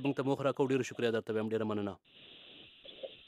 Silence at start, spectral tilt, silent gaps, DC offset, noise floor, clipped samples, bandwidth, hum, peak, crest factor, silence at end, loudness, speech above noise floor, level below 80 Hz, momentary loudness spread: 0 s; -6 dB/octave; none; under 0.1%; -56 dBFS; under 0.1%; 13 kHz; none; -18 dBFS; 18 dB; 0.1 s; -34 LUFS; 22 dB; -78 dBFS; 20 LU